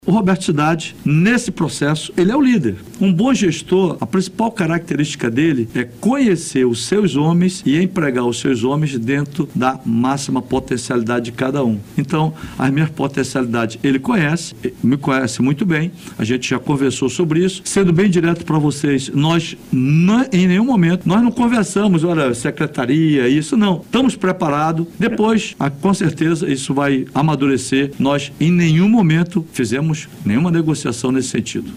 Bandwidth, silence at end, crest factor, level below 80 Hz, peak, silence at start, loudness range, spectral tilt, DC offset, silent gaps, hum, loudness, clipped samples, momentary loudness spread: 15 kHz; 0 s; 12 dB; -48 dBFS; -4 dBFS; 0.05 s; 3 LU; -6 dB/octave; under 0.1%; none; none; -17 LUFS; under 0.1%; 6 LU